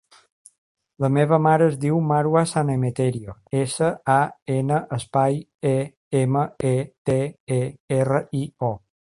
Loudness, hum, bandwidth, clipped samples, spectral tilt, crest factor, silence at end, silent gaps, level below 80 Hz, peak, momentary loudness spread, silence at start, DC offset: -22 LUFS; none; 11.5 kHz; under 0.1%; -7 dB/octave; 18 dB; 0.35 s; 4.42-4.46 s, 5.54-5.59 s, 5.97-6.11 s, 6.98-7.05 s, 7.40-7.47 s, 7.80-7.88 s; -56 dBFS; -4 dBFS; 7 LU; 1 s; under 0.1%